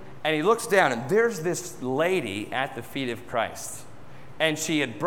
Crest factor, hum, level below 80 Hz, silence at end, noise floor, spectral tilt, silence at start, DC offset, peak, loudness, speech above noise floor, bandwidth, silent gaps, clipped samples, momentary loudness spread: 20 dB; none; -62 dBFS; 0 s; -47 dBFS; -4 dB/octave; 0 s; 0.6%; -6 dBFS; -26 LUFS; 21 dB; 17.5 kHz; none; under 0.1%; 10 LU